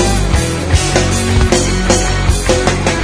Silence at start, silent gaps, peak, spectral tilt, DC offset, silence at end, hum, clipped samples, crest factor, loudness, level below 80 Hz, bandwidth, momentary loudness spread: 0 s; none; 0 dBFS; -4.5 dB/octave; under 0.1%; 0 s; none; under 0.1%; 12 dB; -13 LUFS; -18 dBFS; 11 kHz; 2 LU